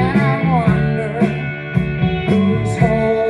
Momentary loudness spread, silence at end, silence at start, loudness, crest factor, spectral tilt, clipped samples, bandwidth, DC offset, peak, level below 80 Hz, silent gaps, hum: 5 LU; 0 s; 0 s; -17 LUFS; 14 dB; -8 dB/octave; under 0.1%; 10 kHz; under 0.1%; -2 dBFS; -34 dBFS; none; none